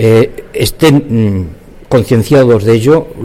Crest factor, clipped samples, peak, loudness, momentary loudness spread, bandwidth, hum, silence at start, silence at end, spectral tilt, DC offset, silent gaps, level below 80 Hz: 10 dB; under 0.1%; 0 dBFS; -10 LUFS; 8 LU; 16 kHz; none; 0 s; 0 s; -6.5 dB/octave; under 0.1%; none; -32 dBFS